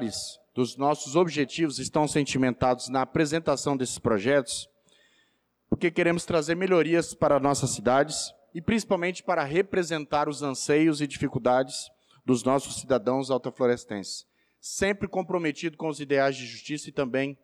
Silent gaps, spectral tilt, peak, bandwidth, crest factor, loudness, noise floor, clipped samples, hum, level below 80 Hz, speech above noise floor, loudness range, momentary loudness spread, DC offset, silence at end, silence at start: none; -4.5 dB/octave; -12 dBFS; 14 kHz; 14 dB; -27 LUFS; -71 dBFS; under 0.1%; none; -58 dBFS; 44 dB; 4 LU; 11 LU; under 0.1%; 0.1 s; 0 s